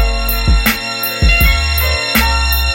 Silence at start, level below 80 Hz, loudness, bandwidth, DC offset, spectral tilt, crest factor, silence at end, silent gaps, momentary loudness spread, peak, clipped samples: 0 s; -16 dBFS; -13 LUFS; 17 kHz; under 0.1%; -3.5 dB/octave; 12 dB; 0 s; none; 5 LU; 0 dBFS; under 0.1%